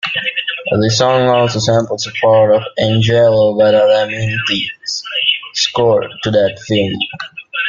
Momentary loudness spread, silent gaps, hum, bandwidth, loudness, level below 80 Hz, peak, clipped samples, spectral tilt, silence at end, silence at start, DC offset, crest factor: 8 LU; none; none; 7.6 kHz; -13 LUFS; -48 dBFS; -2 dBFS; under 0.1%; -4.5 dB/octave; 0 s; 0.05 s; under 0.1%; 12 dB